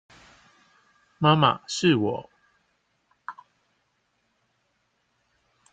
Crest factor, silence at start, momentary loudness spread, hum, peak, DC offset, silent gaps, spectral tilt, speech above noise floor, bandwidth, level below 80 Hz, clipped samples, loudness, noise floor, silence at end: 24 dB; 1.2 s; 23 LU; none; -6 dBFS; under 0.1%; none; -5.5 dB/octave; 51 dB; 9.2 kHz; -66 dBFS; under 0.1%; -23 LUFS; -72 dBFS; 2.4 s